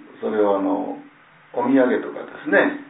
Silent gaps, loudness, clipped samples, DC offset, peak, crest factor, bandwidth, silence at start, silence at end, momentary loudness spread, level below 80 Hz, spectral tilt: none; -21 LUFS; under 0.1%; under 0.1%; -4 dBFS; 18 dB; 4 kHz; 0 s; 0 s; 14 LU; -74 dBFS; -10 dB/octave